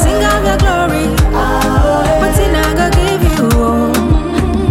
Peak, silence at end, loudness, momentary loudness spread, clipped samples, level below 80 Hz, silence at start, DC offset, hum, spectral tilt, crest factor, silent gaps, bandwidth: -2 dBFS; 0 s; -12 LUFS; 2 LU; under 0.1%; -16 dBFS; 0 s; under 0.1%; none; -5.5 dB/octave; 10 dB; none; 16.5 kHz